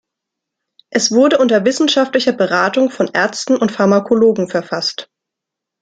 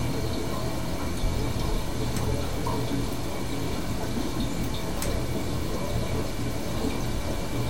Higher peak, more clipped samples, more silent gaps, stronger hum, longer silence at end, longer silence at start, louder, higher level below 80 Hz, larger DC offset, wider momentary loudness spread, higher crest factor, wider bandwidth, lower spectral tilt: first, -2 dBFS vs -14 dBFS; neither; neither; neither; first, 0.8 s vs 0 s; first, 0.95 s vs 0 s; first, -14 LUFS vs -30 LUFS; second, -62 dBFS vs -34 dBFS; second, under 0.1% vs 3%; first, 8 LU vs 2 LU; about the same, 14 dB vs 14 dB; second, 9.4 kHz vs 18 kHz; second, -4 dB/octave vs -5.5 dB/octave